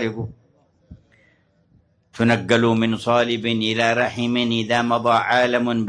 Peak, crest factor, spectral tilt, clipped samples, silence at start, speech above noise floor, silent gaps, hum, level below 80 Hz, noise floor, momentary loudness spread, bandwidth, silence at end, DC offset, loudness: -2 dBFS; 18 dB; -5.5 dB/octave; under 0.1%; 0 s; 40 dB; none; none; -56 dBFS; -60 dBFS; 4 LU; 10.5 kHz; 0 s; under 0.1%; -19 LUFS